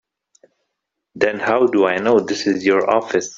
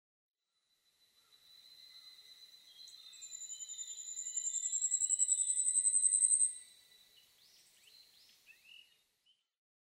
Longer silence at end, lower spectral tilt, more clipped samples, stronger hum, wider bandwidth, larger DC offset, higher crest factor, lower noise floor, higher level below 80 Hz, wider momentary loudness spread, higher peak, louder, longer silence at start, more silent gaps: second, 0 s vs 3.2 s; first, -4.5 dB/octave vs 5.5 dB/octave; neither; neither; second, 7.6 kHz vs 16 kHz; neither; second, 18 dB vs 24 dB; second, -78 dBFS vs -82 dBFS; first, -60 dBFS vs under -90 dBFS; second, 5 LU vs 26 LU; first, 0 dBFS vs -16 dBFS; first, -17 LUFS vs -31 LUFS; second, 1.15 s vs 1.75 s; neither